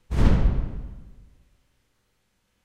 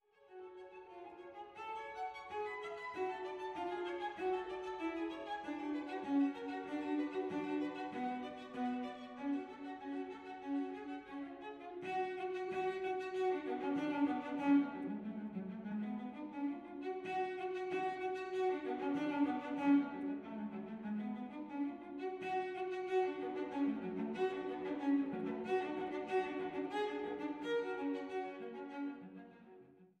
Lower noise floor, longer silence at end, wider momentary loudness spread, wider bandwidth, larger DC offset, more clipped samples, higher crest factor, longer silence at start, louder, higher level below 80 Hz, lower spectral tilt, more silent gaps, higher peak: first, -71 dBFS vs -62 dBFS; first, 1.65 s vs 0.15 s; first, 22 LU vs 11 LU; about the same, 8.6 kHz vs 8.6 kHz; neither; neither; about the same, 22 dB vs 18 dB; about the same, 0.1 s vs 0.2 s; first, -25 LUFS vs -41 LUFS; first, -26 dBFS vs -78 dBFS; first, -8 dB/octave vs -6.5 dB/octave; neither; first, -4 dBFS vs -22 dBFS